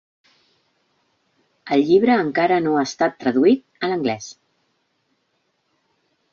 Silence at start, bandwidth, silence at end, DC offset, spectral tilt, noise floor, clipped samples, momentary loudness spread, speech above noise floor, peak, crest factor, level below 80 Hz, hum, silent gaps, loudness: 1.65 s; 7.4 kHz; 2 s; under 0.1%; -5.5 dB/octave; -69 dBFS; under 0.1%; 10 LU; 51 dB; -4 dBFS; 18 dB; -64 dBFS; none; none; -19 LUFS